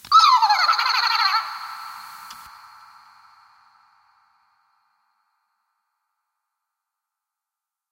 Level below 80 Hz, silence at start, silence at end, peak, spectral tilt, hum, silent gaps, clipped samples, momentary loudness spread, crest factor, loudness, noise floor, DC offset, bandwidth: -76 dBFS; 0.1 s; 5.5 s; -2 dBFS; 3 dB/octave; none; none; under 0.1%; 25 LU; 22 dB; -17 LUFS; -87 dBFS; under 0.1%; 16 kHz